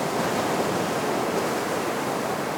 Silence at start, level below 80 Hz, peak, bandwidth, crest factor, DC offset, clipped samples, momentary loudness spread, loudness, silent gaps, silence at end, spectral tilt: 0 s; -60 dBFS; -12 dBFS; over 20 kHz; 14 dB; under 0.1%; under 0.1%; 2 LU; -25 LUFS; none; 0 s; -4 dB/octave